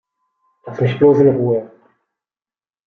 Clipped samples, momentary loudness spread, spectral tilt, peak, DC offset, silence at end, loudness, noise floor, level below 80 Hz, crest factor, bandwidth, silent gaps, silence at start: under 0.1%; 11 LU; -10 dB/octave; -2 dBFS; under 0.1%; 1.2 s; -15 LUFS; under -90 dBFS; -58 dBFS; 16 dB; 6.2 kHz; none; 0.65 s